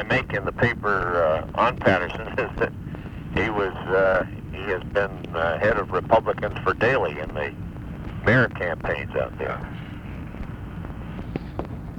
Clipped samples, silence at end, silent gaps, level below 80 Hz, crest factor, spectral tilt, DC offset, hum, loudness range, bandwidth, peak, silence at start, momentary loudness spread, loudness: under 0.1%; 0 s; none; -40 dBFS; 22 dB; -7.5 dB/octave; under 0.1%; none; 3 LU; 18.5 kHz; -2 dBFS; 0 s; 15 LU; -24 LUFS